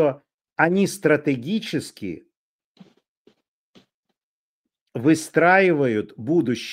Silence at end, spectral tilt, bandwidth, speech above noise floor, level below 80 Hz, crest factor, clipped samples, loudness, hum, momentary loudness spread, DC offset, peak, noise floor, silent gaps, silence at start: 0 s; -5.5 dB/octave; 16 kHz; over 70 dB; -68 dBFS; 20 dB; under 0.1%; -20 LUFS; none; 18 LU; under 0.1%; -2 dBFS; under -90 dBFS; 0.34-0.38 s, 2.36-2.75 s, 3.08-3.25 s, 3.48-3.74 s, 3.94-4.03 s, 4.23-4.64 s, 4.81-4.86 s; 0 s